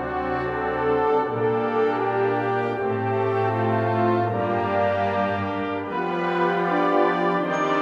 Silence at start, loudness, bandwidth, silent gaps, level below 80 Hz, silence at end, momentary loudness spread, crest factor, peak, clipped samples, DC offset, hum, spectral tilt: 0 s; -23 LUFS; 7.4 kHz; none; -52 dBFS; 0 s; 5 LU; 16 dB; -6 dBFS; under 0.1%; under 0.1%; none; -7.5 dB/octave